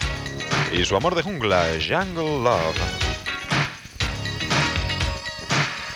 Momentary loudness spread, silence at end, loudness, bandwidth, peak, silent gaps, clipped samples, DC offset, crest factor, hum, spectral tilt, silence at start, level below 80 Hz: 7 LU; 0 s; -23 LUFS; 18.5 kHz; -6 dBFS; none; under 0.1%; under 0.1%; 18 dB; none; -4 dB/octave; 0 s; -36 dBFS